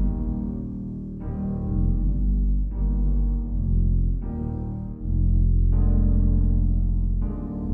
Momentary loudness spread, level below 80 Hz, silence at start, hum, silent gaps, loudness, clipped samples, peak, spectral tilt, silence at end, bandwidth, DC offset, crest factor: 9 LU; -24 dBFS; 0 s; none; none; -26 LUFS; under 0.1%; -10 dBFS; -13.5 dB/octave; 0 s; 1.5 kHz; under 0.1%; 12 dB